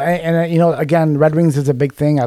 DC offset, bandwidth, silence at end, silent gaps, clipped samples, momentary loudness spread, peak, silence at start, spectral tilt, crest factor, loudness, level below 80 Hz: under 0.1%; 13 kHz; 0 s; none; under 0.1%; 3 LU; -2 dBFS; 0 s; -8 dB/octave; 12 dB; -15 LUFS; -50 dBFS